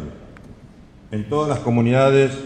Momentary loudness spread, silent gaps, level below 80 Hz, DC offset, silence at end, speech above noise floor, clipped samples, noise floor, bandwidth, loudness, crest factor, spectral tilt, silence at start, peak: 16 LU; none; -46 dBFS; under 0.1%; 0 s; 27 dB; under 0.1%; -45 dBFS; 9.2 kHz; -18 LUFS; 16 dB; -7 dB/octave; 0 s; -4 dBFS